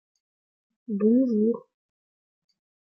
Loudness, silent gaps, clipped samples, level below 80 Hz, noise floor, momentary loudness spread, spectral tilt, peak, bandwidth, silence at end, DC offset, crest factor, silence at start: -24 LUFS; none; under 0.1%; -80 dBFS; under -90 dBFS; 13 LU; -11.5 dB/octave; -12 dBFS; 5.4 kHz; 1.3 s; under 0.1%; 16 dB; 0.9 s